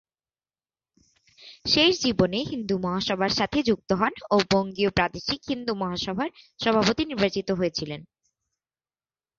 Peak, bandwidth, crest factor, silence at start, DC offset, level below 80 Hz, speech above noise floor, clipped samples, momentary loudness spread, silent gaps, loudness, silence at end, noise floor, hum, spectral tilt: -6 dBFS; 7.6 kHz; 20 dB; 1.4 s; under 0.1%; -52 dBFS; over 65 dB; under 0.1%; 9 LU; none; -25 LUFS; 1.35 s; under -90 dBFS; none; -4.5 dB/octave